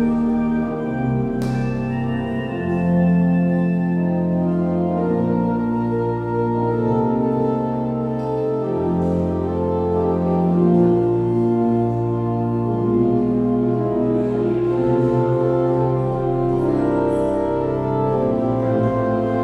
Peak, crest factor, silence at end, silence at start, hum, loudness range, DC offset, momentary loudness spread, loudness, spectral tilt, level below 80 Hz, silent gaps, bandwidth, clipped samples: -4 dBFS; 14 dB; 0 s; 0 s; none; 2 LU; under 0.1%; 5 LU; -19 LUFS; -10.5 dB/octave; -42 dBFS; none; 5.8 kHz; under 0.1%